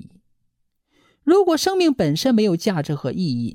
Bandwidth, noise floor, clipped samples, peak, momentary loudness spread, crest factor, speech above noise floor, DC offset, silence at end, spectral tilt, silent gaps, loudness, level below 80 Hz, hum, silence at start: 16.5 kHz; -69 dBFS; under 0.1%; -4 dBFS; 8 LU; 16 dB; 51 dB; under 0.1%; 0 s; -5.5 dB/octave; none; -19 LUFS; -56 dBFS; none; 1.25 s